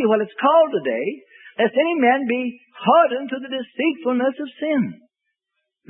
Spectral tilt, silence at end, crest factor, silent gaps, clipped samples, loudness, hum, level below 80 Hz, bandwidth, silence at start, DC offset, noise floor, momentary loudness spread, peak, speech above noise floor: -10 dB/octave; 0.95 s; 18 dB; none; under 0.1%; -20 LUFS; none; -76 dBFS; 3.9 kHz; 0 s; under 0.1%; -78 dBFS; 12 LU; -4 dBFS; 59 dB